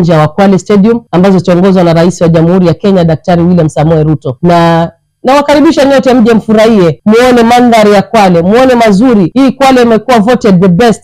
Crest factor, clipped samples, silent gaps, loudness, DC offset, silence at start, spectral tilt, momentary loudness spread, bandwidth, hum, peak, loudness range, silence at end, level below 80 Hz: 4 dB; 0.8%; none; -5 LUFS; under 0.1%; 0 s; -7 dB/octave; 4 LU; 15 kHz; none; 0 dBFS; 2 LU; 0.05 s; -34 dBFS